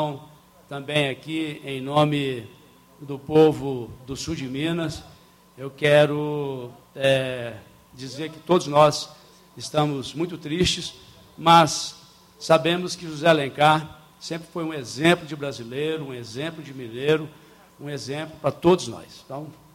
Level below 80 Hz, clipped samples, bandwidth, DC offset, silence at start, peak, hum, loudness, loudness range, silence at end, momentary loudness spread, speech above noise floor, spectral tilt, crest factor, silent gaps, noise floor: -54 dBFS; under 0.1%; 16.5 kHz; under 0.1%; 0 s; -2 dBFS; none; -23 LUFS; 6 LU; 0.25 s; 19 LU; 26 dB; -5 dB/octave; 22 dB; none; -50 dBFS